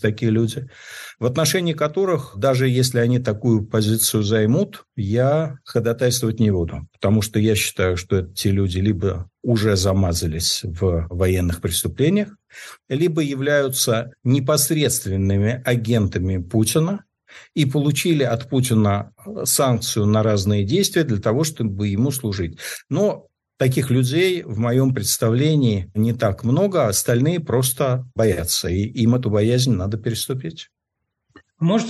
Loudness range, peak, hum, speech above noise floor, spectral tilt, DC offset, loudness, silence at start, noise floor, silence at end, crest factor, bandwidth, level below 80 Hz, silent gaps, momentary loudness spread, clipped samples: 2 LU; -6 dBFS; none; 59 dB; -5 dB/octave; under 0.1%; -20 LUFS; 0 s; -79 dBFS; 0 s; 14 dB; 12.5 kHz; -44 dBFS; none; 7 LU; under 0.1%